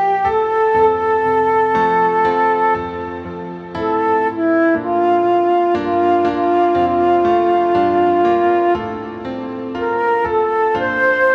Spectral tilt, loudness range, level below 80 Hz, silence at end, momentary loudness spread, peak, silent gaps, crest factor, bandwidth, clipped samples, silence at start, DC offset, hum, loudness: -7.5 dB/octave; 2 LU; -48 dBFS; 0 s; 11 LU; -2 dBFS; none; 12 dB; 6.4 kHz; under 0.1%; 0 s; under 0.1%; none; -16 LUFS